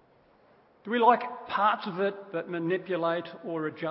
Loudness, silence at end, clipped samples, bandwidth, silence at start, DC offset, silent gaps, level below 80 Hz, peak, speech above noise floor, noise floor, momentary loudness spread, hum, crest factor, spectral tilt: -29 LUFS; 0 s; under 0.1%; 5.8 kHz; 0.85 s; under 0.1%; none; -78 dBFS; -8 dBFS; 33 dB; -62 dBFS; 11 LU; none; 20 dB; -9.5 dB/octave